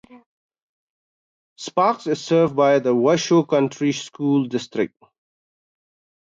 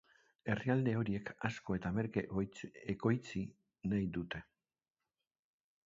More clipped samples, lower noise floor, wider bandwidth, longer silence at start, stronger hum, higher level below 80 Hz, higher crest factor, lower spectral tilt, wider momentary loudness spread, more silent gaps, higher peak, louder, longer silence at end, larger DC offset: neither; about the same, under -90 dBFS vs under -90 dBFS; about the same, 7.8 kHz vs 7.4 kHz; second, 0.15 s vs 0.45 s; neither; second, -68 dBFS vs -62 dBFS; about the same, 16 dB vs 20 dB; second, -5.5 dB/octave vs -7 dB/octave; about the same, 9 LU vs 11 LU; first, 0.26-0.49 s, 0.62-1.56 s vs none; first, -6 dBFS vs -18 dBFS; first, -20 LUFS vs -39 LUFS; about the same, 1.35 s vs 1.45 s; neither